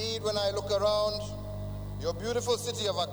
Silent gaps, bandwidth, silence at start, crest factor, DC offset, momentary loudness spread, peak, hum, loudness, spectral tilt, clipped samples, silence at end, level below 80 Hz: none; over 20 kHz; 0 s; 16 dB; under 0.1%; 11 LU; -16 dBFS; 50 Hz at -40 dBFS; -31 LUFS; -4 dB/octave; under 0.1%; 0 s; -48 dBFS